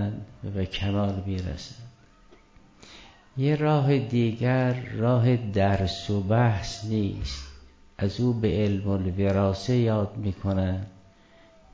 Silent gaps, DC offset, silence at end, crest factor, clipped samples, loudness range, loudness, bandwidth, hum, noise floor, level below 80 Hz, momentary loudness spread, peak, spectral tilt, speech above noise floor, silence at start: none; under 0.1%; 0.8 s; 16 dB; under 0.1%; 5 LU; -26 LUFS; 8 kHz; none; -55 dBFS; -42 dBFS; 12 LU; -10 dBFS; -7.5 dB/octave; 30 dB; 0 s